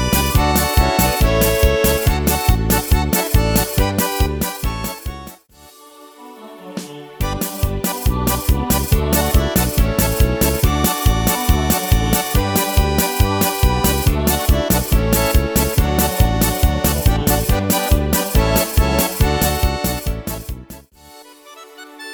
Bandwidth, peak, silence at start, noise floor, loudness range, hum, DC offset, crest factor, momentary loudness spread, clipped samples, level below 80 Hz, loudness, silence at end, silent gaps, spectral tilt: over 20 kHz; 0 dBFS; 0 s; -45 dBFS; 7 LU; none; under 0.1%; 16 dB; 11 LU; under 0.1%; -20 dBFS; -17 LUFS; 0 s; none; -4.5 dB/octave